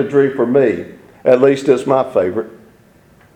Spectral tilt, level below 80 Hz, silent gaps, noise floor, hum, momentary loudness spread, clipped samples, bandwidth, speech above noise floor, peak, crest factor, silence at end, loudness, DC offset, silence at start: -7 dB/octave; -58 dBFS; none; -48 dBFS; none; 13 LU; under 0.1%; 9.4 kHz; 34 dB; 0 dBFS; 16 dB; 0.85 s; -15 LUFS; under 0.1%; 0 s